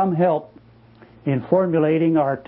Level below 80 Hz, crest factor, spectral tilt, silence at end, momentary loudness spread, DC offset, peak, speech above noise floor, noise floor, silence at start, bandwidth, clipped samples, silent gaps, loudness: -60 dBFS; 16 dB; -13 dB/octave; 0.05 s; 8 LU; under 0.1%; -4 dBFS; 30 dB; -49 dBFS; 0 s; 4.2 kHz; under 0.1%; none; -20 LUFS